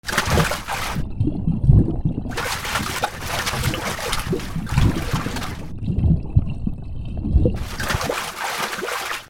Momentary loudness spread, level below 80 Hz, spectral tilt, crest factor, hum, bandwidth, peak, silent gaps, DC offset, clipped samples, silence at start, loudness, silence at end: 9 LU; -28 dBFS; -5 dB/octave; 22 dB; none; 18.5 kHz; 0 dBFS; none; under 0.1%; under 0.1%; 0.05 s; -23 LUFS; 0 s